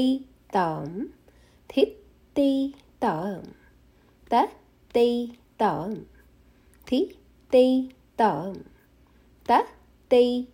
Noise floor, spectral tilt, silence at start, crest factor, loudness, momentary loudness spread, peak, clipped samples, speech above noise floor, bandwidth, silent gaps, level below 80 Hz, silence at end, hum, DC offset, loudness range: -58 dBFS; -6.5 dB/octave; 0 s; 20 dB; -25 LUFS; 16 LU; -8 dBFS; under 0.1%; 34 dB; 16 kHz; none; -58 dBFS; 0.1 s; 60 Hz at -60 dBFS; under 0.1%; 3 LU